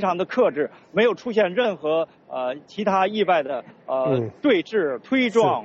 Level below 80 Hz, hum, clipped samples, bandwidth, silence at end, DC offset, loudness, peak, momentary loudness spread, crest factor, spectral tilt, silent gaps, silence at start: -66 dBFS; none; under 0.1%; 7.6 kHz; 0 s; under 0.1%; -22 LUFS; -6 dBFS; 8 LU; 14 dB; -3.5 dB/octave; none; 0 s